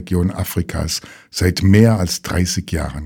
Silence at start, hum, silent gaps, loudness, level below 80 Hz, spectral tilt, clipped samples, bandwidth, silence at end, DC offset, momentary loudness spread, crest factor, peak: 0 s; none; none; -17 LUFS; -32 dBFS; -5.5 dB/octave; 0.1%; 19 kHz; 0 s; under 0.1%; 11 LU; 16 dB; 0 dBFS